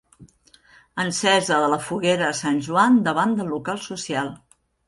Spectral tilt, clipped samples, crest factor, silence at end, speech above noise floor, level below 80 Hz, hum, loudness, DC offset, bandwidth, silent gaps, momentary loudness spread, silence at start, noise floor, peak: -4 dB/octave; under 0.1%; 18 dB; 0.5 s; 34 dB; -60 dBFS; none; -21 LUFS; under 0.1%; 11.5 kHz; none; 11 LU; 0.2 s; -55 dBFS; -4 dBFS